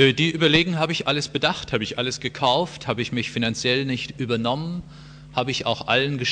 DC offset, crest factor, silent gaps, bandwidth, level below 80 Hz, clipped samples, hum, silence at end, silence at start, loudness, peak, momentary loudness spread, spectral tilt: under 0.1%; 20 dB; none; 10 kHz; -50 dBFS; under 0.1%; none; 0 s; 0 s; -22 LUFS; -4 dBFS; 9 LU; -4.5 dB/octave